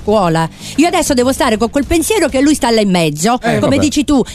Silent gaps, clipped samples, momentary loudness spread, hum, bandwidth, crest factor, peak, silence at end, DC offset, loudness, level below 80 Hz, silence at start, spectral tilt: none; under 0.1%; 3 LU; none; 14 kHz; 12 dB; 0 dBFS; 0 s; 0.1%; -12 LUFS; -32 dBFS; 0 s; -4.5 dB/octave